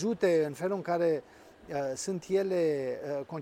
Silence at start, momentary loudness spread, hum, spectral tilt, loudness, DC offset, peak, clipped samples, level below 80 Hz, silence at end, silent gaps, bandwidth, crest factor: 0 s; 8 LU; none; -5.5 dB/octave; -31 LUFS; under 0.1%; -16 dBFS; under 0.1%; -70 dBFS; 0 s; none; 15.5 kHz; 14 dB